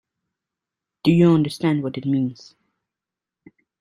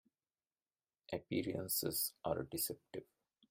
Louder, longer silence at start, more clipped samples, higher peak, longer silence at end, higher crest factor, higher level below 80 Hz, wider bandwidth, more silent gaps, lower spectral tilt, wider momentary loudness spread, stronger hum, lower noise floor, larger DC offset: first, -20 LUFS vs -40 LUFS; about the same, 1.05 s vs 1.1 s; neither; first, -4 dBFS vs -22 dBFS; first, 1.45 s vs 0.45 s; about the same, 18 dB vs 20 dB; first, -60 dBFS vs -72 dBFS; second, 11.5 kHz vs 16 kHz; neither; first, -8 dB/octave vs -3.5 dB/octave; second, 8 LU vs 12 LU; neither; about the same, -88 dBFS vs under -90 dBFS; neither